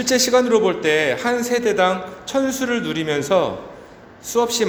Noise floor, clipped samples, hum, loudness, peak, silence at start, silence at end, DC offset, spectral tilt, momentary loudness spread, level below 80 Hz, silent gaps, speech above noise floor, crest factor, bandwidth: -41 dBFS; under 0.1%; none; -19 LUFS; -2 dBFS; 0 s; 0 s; under 0.1%; -3 dB/octave; 10 LU; -56 dBFS; none; 23 dB; 16 dB; over 20 kHz